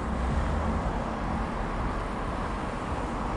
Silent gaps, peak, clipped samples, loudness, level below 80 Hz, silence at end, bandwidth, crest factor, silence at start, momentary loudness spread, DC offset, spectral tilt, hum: none; -16 dBFS; under 0.1%; -31 LUFS; -34 dBFS; 0 s; 11.5 kHz; 14 dB; 0 s; 3 LU; under 0.1%; -7 dB/octave; none